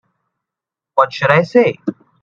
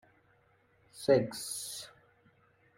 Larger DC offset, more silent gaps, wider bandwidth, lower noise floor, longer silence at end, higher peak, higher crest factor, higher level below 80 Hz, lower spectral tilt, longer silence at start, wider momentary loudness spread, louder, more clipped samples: neither; neither; second, 7.4 kHz vs 16 kHz; first, -85 dBFS vs -69 dBFS; second, 0.3 s vs 0.9 s; first, 0 dBFS vs -14 dBFS; second, 16 dB vs 22 dB; first, -60 dBFS vs -72 dBFS; first, -7 dB/octave vs -4.5 dB/octave; about the same, 0.95 s vs 0.95 s; second, 13 LU vs 16 LU; first, -14 LUFS vs -33 LUFS; neither